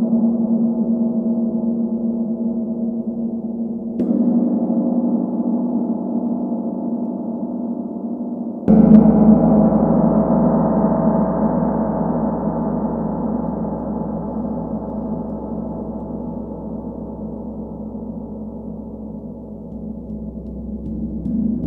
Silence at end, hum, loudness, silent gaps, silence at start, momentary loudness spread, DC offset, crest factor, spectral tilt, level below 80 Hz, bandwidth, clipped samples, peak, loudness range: 0 s; none; -19 LUFS; none; 0 s; 15 LU; under 0.1%; 18 dB; -13.5 dB/octave; -40 dBFS; 2.1 kHz; under 0.1%; 0 dBFS; 15 LU